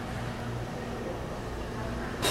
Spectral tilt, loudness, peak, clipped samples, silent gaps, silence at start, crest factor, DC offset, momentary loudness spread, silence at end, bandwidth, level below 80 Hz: -4.5 dB/octave; -35 LUFS; -14 dBFS; under 0.1%; none; 0 s; 20 dB; under 0.1%; 2 LU; 0 s; 16 kHz; -44 dBFS